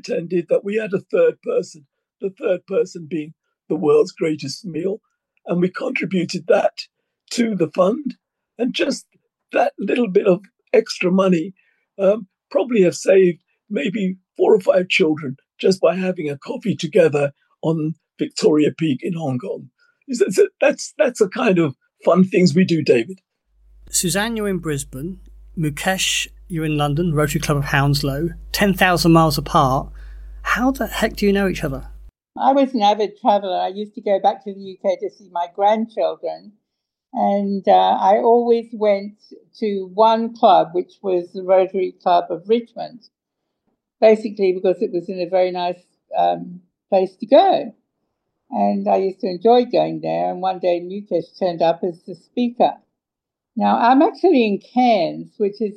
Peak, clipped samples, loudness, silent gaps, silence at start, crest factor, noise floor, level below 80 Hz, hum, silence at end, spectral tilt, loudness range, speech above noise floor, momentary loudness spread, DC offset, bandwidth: -2 dBFS; under 0.1%; -19 LUFS; none; 0.05 s; 18 dB; -84 dBFS; -44 dBFS; none; 0 s; -5.5 dB/octave; 4 LU; 66 dB; 12 LU; under 0.1%; 16.5 kHz